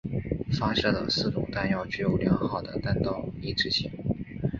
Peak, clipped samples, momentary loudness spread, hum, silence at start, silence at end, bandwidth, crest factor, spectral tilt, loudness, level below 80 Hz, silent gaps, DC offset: -10 dBFS; under 0.1%; 7 LU; none; 0.05 s; 0 s; 7.4 kHz; 18 dB; -6 dB/octave; -28 LUFS; -44 dBFS; none; under 0.1%